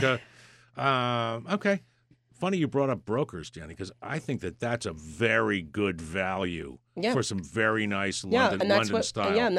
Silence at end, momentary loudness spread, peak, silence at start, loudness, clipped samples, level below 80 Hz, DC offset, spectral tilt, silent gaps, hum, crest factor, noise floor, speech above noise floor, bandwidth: 0 s; 12 LU; -8 dBFS; 0 s; -28 LUFS; under 0.1%; -58 dBFS; under 0.1%; -5 dB/octave; none; none; 20 dB; -63 dBFS; 35 dB; 12.5 kHz